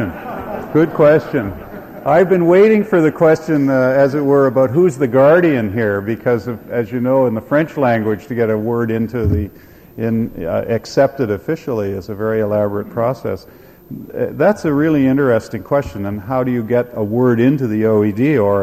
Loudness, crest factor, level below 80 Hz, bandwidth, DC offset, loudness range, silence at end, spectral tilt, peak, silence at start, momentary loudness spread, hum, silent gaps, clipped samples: -15 LUFS; 14 dB; -42 dBFS; 15 kHz; under 0.1%; 6 LU; 0 s; -8.5 dB/octave; -2 dBFS; 0 s; 12 LU; none; none; under 0.1%